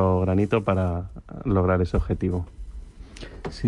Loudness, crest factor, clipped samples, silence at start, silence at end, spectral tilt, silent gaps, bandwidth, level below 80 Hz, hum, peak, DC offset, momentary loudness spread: -24 LUFS; 16 dB; under 0.1%; 0 s; 0 s; -9 dB/octave; none; 9.8 kHz; -38 dBFS; none; -8 dBFS; under 0.1%; 21 LU